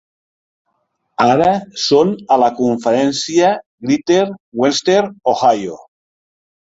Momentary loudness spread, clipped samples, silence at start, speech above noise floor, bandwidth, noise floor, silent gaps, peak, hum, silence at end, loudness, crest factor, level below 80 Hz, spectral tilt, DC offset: 6 LU; under 0.1%; 1.2 s; 54 dB; 8 kHz; -68 dBFS; 3.66-3.78 s, 4.40-4.52 s; -2 dBFS; none; 1 s; -15 LUFS; 14 dB; -56 dBFS; -4.5 dB/octave; under 0.1%